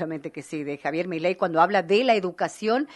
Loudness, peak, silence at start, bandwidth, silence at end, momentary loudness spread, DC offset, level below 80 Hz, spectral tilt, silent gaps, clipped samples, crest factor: -24 LUFS; -6 dBFS; 0 s; 11.5 kHz; 0 s; 12 LU; under 0.1%; -72 dBFS; -5.5 dB/octave; none; under 0.1%; 18 dB